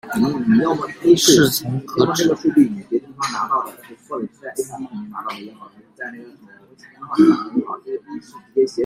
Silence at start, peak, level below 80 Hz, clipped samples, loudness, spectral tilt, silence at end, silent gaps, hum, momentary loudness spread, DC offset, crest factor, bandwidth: 0.05 s; -2 dBFS; -58 dBFS; under 0.1%; -18 LUFS; -4.5 dB/octave; 0 s; none; none; 19 LU; under 0.1%; 18 dB; 16 kHz